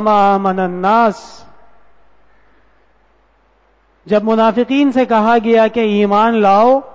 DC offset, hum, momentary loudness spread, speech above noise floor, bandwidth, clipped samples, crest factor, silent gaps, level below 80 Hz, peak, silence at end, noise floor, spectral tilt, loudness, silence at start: under 0.1%; none; 6 LU; 43 dB; 7.8 kHz; under 0.1%; 12 dB; none; -54 dBFS; -2 dBFS; 0.05 s; -55 dBFS; -7 dB/octave; -12 LUFS; 0 s